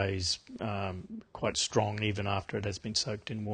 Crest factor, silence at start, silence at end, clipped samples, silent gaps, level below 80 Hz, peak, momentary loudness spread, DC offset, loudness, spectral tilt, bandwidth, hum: 22 dB; 0 s; 0 s; under 0.1%; none; -52 dBFS; -12 dBFS; 8 LU; under 0.1%; -33 LUFS; -4 dB/octave; 9.6 kHz; none